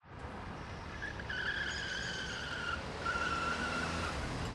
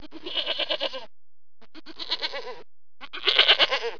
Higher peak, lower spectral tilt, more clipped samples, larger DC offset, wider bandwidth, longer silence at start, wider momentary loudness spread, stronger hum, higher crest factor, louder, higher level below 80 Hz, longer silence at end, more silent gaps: second, -24 dBFS vs -4 dBFS; first, -3.5 dB/octave vs -1 dB/octave; neither; second, under 0.1% vs 1%; first, 13 kHz vs 5.4 kHz; about the same, 0.05 s vs 0 s; second, 11 LU vs 22 LU; neither; second, 16 dB vs 24 dB; second, -38 LUFS vs -23 LUFS; first, -50 dBFS vs -66 dBFS; about the same, 0 s vs 0 s; neither